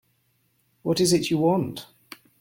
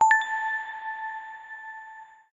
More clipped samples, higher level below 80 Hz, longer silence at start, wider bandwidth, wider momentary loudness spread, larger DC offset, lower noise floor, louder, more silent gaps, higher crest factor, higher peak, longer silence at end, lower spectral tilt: neither; first, -60 dBFS vs -78 dBFS; first, 0.85 s vs 0 s; first, 17 kHz vs 7.6 kHz; second, 17 LU vs 20 LU; neither; first, -68 dBFS vs -47 dBFS; first, -23 LUFS vs -28 LUFS; neither; about the same, 18 dB vs 20 dB; about the same, -8 dBFS vs -8 dBFS; first, 0.55 s vs 0.25 s; first, -5 dB/octave vs 1.5 dB/octave